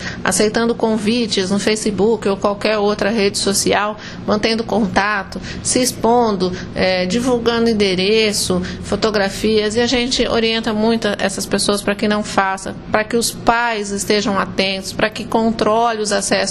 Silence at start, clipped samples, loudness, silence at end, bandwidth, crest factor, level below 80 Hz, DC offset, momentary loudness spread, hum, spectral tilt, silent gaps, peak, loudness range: 0 s; under 0.1%; -17 LUFS; 0 s; 13 kHz; 16 dB; -40 dBFS; under 0.1%; 5 LU; none; -3.5 dB/octave; none; 0 dBFS; 2 LU